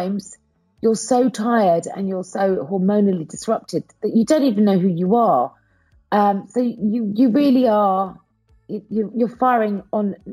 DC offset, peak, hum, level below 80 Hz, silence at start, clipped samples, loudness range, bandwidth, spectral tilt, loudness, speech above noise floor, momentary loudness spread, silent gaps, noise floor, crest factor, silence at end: under 0.1%; -4 dBFS; none; -62 dBFS; 0 s; under 0.1%; 2 LU; 15 kHz; -6.5 dB/octave; -19 LUFS; 40 dB; 9 LU; none; -58 dBFS; 14 dB; 0 s